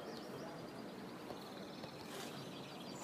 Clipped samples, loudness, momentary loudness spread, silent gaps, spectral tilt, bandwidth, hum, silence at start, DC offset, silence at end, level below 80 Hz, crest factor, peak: under 0.1%; -49 LUFS; 2 LU; none; -4.5 dB/octave; 15.5 kHz; none; 0 s; under 0.1%; 0 s; -78 dBFS; 16 dB; -34 dBFS